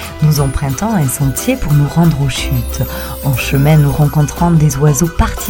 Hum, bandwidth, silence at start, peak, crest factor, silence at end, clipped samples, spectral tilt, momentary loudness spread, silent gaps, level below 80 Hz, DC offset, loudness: none; 17 kHz; 0 s; 0 dBFS; 12 dB; 0 s; under 0.1%; -6 dB/octave; 7 LU; none; -24 dBFS; under 0.1%; -13 LUFS